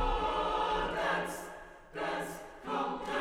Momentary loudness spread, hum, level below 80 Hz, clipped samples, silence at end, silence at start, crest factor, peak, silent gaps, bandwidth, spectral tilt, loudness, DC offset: 13 LU; none; -46 dBFS; under 0.1%; 0 s; 0 s; 16 dB; -20 dBFS; none; 17 kHz; -4 dB/octave; -34 LUFS; under 0.1%